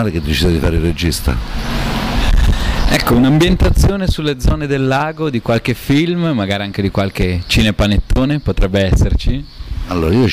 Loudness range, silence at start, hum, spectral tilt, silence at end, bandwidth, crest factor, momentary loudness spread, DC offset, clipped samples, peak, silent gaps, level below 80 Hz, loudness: 2 LU; 0 s; none; -6 dB/octave; 0 s; 16 kHz; 8 dB; 7 LU; under 0.1%; under 0.1%; -4 dBFS; none; -18 dBFS; -15 LUFS